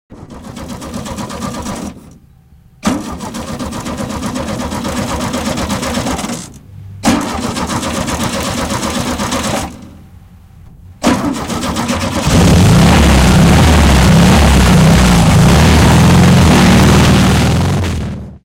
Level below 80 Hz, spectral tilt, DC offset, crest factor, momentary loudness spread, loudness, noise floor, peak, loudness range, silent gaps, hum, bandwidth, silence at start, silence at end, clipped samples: -20 dBFS; -5.5 dB/octave; under 0.1%; 10 dB; 16 LU; -11 LUFS; -43 dBFS; 0 dBFS; 14 LU; none; none; 16.5 kHz; 0.1 s; 0.05 s; under 0.1%